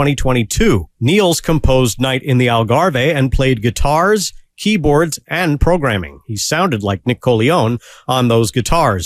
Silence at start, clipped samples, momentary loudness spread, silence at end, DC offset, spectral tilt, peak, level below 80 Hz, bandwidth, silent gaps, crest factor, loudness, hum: 0 s; under 0.1%; 5 LU; 0 s; under 0.1%; -5 dB/octave; 0 dBFS; -26 dBFS; 16 kHz; none; 14 dB; -15 LUFS; none